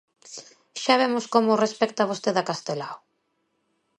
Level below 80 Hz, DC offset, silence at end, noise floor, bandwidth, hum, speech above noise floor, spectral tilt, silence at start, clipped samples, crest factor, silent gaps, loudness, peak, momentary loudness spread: -76 dBFS; under 0.1%; 1.05 s; -73 dBFS; 11 kHz; none; 50 dB; -4 dB/octave; 0.25 s; under 0.1%; 22 dB; none; -24 LUFS; -4 dBFS; 20 LU